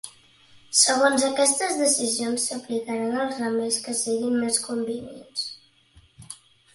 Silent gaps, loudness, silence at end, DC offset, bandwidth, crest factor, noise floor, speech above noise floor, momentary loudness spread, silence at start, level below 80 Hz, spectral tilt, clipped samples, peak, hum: none; -23 LUFS; 0.4 s; under 0.1%; 12 kHz; 22 dB; -57 dBFS; 33 dB; 16 LU; 0.05 s; -66 dBFS; -1.5 dB/octave; under 0.1%; -4 dBFS; none